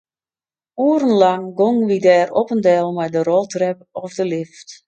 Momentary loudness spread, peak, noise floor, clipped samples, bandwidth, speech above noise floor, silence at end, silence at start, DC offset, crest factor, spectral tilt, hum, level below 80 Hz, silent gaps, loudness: 13 LU; 0 dBFS; under -90 dBFS; under 0.1%; 8.8 kHz; over 73 dB; 0.15 s; 0.75 s; under 0.1%; 16 dB; -6 dB/octave; none; -68 dBFS; none; -17 LUFS